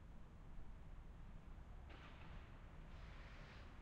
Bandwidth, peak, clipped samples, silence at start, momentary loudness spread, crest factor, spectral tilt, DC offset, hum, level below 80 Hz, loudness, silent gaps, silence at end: 8.8 kHz; -44 dBFS; under 0.1%; 0 s; 3 LU; 12 dB; -6.5 dB/octave; under 0.1%; none; -58 dBFS; -60 LUFS; none; 0 s